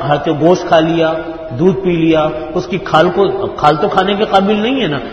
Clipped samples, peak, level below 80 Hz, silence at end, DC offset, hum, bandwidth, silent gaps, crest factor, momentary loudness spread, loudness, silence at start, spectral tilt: 0.2%; 0 dBFS; -40 dBFS; 0 s; under 0.1%; none; 8.2 kHz; none; 12 dB; 7 LU; -13 LUFS; 0 s; -6.5 dB/octave